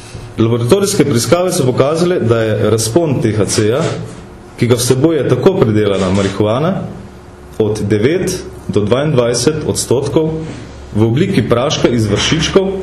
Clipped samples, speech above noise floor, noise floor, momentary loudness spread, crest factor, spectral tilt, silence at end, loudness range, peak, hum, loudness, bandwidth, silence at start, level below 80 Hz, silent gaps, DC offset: under 0.1%; 21 dB; -34 dBFS; 11 LU; 14 dB; -5.5 dB/octave; 0 s; 3 LU; 0 dBFS; none; -13 LUFS; 13 kHz; 0 s; -36 dBFS; none; under 0.1%